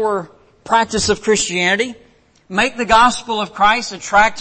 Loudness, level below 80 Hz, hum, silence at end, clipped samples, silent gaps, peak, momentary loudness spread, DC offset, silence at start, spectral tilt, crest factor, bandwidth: -16 LUFS; -40 dBFS; none; 0 s; under 0.1%; none; -2 dBFS; 10 LU; under 0.1%; 0 s; -2.5 dB/octave; 14 dB; 8.8 kHz